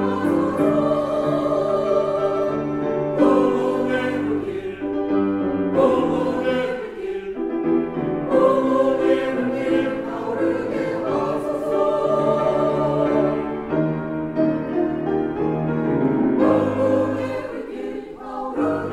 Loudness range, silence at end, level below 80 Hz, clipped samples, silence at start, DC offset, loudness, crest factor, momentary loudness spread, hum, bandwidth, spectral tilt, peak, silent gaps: 2 LU; 0 s; -52 dBFS; under 0.1%; 0 s; under 0.1%; -21 LUFS; 16 dB; 9 LU; none; 11.5 kHz; -8 dB/octave; -4 dBFS; none